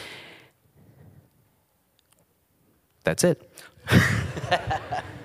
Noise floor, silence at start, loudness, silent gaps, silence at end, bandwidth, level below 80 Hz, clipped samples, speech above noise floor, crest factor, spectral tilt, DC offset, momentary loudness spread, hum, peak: -67 dBFS; 0 s; -24 LUFS; none; 0 s; 15.5 kHz; -48 dBFS; under 0.1%; 43 dB; 24 dB; -5 dB/octave; under 0.1%; 22 LU; none; -4 dBFS